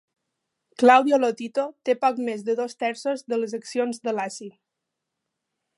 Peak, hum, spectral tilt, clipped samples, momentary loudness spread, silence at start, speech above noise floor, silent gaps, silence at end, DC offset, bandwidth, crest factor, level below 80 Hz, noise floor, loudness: -2 dBFS; none; -4 dB/octave; under 0.1%; 13 LU; 0.8 s; 60 dB; none; 1.3 s; under 0.1%; 11.5 kHz; 22 dB; -82 dBFS; -83 dBFS; -23 LUFS